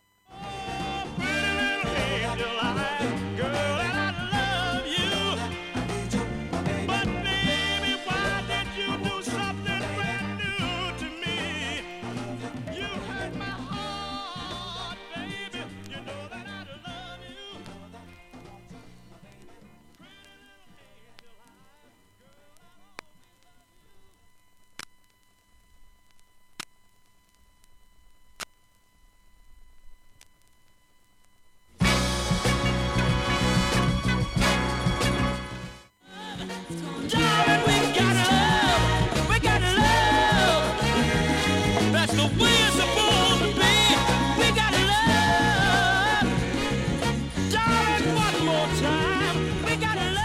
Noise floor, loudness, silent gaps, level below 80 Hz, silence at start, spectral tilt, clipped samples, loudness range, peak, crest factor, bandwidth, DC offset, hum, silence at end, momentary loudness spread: -62 dBFS; -24 LUFS; none; -40 dBFS; 0.3 s; -4 dB/octave; under 0.1%; 15 LU; -8 dBFS; 18 dB; 16 kHz; under 0.1%; none; 0 s; 18 LU